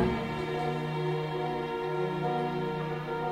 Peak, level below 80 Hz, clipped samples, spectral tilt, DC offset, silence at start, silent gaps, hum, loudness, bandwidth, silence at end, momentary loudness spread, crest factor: -14 dBFS; -52 dBFS; under 0.1%; -7.5 dB/octave; under 0.1%; 0 s; none; none; -32 LUFS; 13 kHz; 0 s; 2 LU; 16 dB